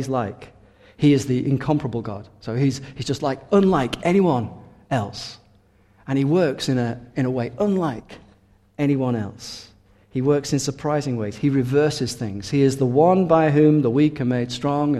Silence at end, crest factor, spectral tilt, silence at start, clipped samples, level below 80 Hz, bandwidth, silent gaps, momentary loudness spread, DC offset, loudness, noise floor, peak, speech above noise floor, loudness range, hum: 0 s; 18 dB; -6.5 dB/octave; 0 s; under 0.1%; -52 dBFS; 13 kHz; none; 14 LU; under 0.1%; -21 LUFS; -56 dBFS; -2 dBFS; 36 dB; 6 LU; none